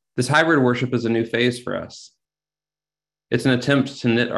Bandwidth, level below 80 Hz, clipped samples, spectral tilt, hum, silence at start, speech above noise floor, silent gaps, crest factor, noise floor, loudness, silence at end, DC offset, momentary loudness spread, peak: 12 kHz; -58 dBFS; under 0.1%; -5.5 dB/octave; 50 Hz at -55 dBFS; 0.15 s; over 70 dB; none; 20 dB; under -90 dBFS; -20 LUFS; 0 s; under 0.1%; 12 LU; -2 dBFS